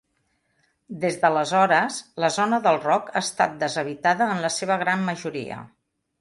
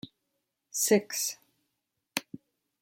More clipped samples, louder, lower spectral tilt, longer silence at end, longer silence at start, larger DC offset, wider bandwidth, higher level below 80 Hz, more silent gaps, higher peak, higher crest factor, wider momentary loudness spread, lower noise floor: neither; first, -23 LUFS vs -30 LUFS; first, -4 dB/octave vs -2.5 dB/octave; about the same, 0.55 s vs 0.6 s; first, 0.9 s vs 0.05 s; neither; second, 11.5 kHz vs 16.5 kHz; first, -68 dBFS vs -82 dBFS; neither; first, -6 dBFS vs -10 dBFS; second, 18 dB vs 24 dB; second, 11 LU vs 25 LU; second, -71 dBFS vs -82 dBFS